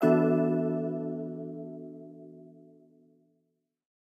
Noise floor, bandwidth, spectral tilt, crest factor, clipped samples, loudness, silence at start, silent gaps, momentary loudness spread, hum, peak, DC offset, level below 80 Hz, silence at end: -78 dBFS; 12.5 kHz; -10 dB/octave; 20 dB; under 0.1%; -30 LUFS; 0 s; none; 25 LU; none; -10 dBFS; under 0.1%; -86 dBFS; 1.6 s